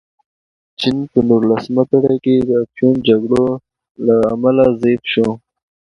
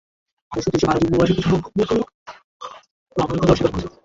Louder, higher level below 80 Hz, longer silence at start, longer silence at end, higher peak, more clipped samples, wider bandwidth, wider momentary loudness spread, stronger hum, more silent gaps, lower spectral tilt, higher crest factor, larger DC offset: first, -15 LUFS vs -20 LUFS; second, -48 dBFS vs -40 dBFS; first, 0.8 s vs 0.5 s; first, 0.55 s vs 0.15 s; about the same, 0 dBFS vs -2 dBFS; neither; first, 10.5 kHz vs 7.8 kHz; second, 7 LU vs 19 LU; neither; second, 3.91-3.95 s vs 2.14-2.26 s, 2.44-2.60 s, 2.91-3.06 s; about the same, -7.5 dB/octave vs -7 dB/octave; about the same, 14 dB vs 18 dB; neither